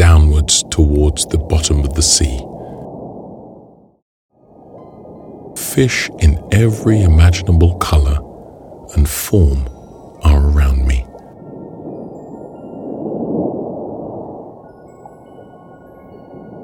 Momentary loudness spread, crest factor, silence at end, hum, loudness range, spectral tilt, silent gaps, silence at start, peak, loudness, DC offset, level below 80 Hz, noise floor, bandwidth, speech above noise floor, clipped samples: 24 LU; 16 dB; 0 s; none; 12 LU; -5 dB/octave; 4.02-4.29 s; 0 s; 0 dBFS; -14 LUFS; under 0.1%; -20 dBFS; -42 dBFS; 17 kHz; 30 dB; under 0.1%